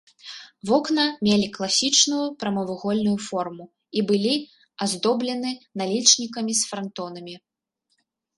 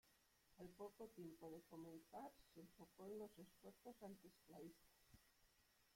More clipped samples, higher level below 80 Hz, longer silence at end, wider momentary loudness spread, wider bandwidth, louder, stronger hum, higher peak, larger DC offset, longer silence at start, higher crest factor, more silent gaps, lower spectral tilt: neither; first, -66 dBFS vs -84 dBFS; first, 1 s vs 0 s; first, 18 LU vs 8 LU; second, 11.5 kHz vs 16.5 kHz; first, -22 LUFS vs -61 LUFS; neither; first, -2 dBFS vs -46 dBFS; neither; first, 0.25 s vs 0.05 s; first, 22 dB vs 16 dB; neither; second, -3 dB/octave vs -6 dB/octave